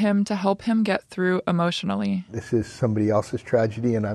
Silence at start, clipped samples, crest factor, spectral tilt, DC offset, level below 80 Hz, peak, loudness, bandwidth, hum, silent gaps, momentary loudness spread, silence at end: 0 s; under 0.1%; 14 dB; -7 dB/octave; under 0.1%; -56 dBFS; -8 dBFS; -24 LUFS; 11.5 kHz; none; none; 4 LU; 0 s